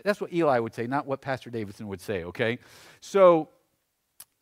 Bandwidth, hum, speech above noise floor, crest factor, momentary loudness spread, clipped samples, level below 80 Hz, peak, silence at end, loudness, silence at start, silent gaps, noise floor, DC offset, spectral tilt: 15 kHz; none; 49 dB; 20 dB; 18 LU; under 0.1%; -66 dBFS; -6 dBFS; 0.2 s; -26 LUFS; 0.05 s; none; -75 dBFS; under 0.1%; -6 dB/octave